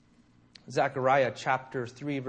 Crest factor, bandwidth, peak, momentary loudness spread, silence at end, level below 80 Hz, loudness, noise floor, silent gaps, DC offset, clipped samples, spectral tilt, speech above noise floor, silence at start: 18 dB; 9.4 kHz; -12 dBFS; 10 LU; 0 s; -70 dBFS; -29 LUFS; -62 dBFS; none; under 0.1%; under 0.1%; -5.5 dB/octave; 33 dB; 0.65 s